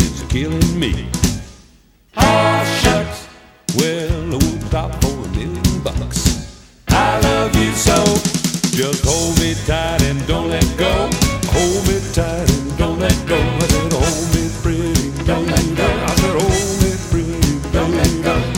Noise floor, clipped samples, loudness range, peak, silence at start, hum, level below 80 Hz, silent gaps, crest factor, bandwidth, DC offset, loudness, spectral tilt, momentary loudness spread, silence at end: -49 dBFS; under 0.1%; 3 LU; 0 dBFS; 0 s; none; -24 dBFS; none; 16 dB; 17.5 kHz; under 0.1%; -16 LUFS; -4.5 dB/octave; 6 LU; 0 s